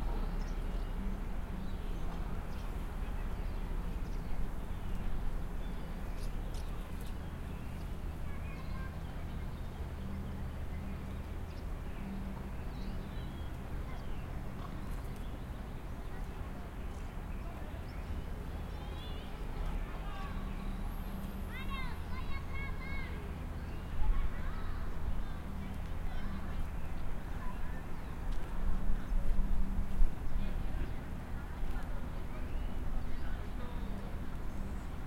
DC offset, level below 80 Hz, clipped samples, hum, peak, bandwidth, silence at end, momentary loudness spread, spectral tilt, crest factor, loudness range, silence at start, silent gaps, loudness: under 0.1%; -38 dBFS; under 0.1%; none; -14 dBFS; 15.5 kHz; 0 s; 4 LU; -6.5 dB/octave; 20 dB; 4 LU; 0 s; none; -43 LUFS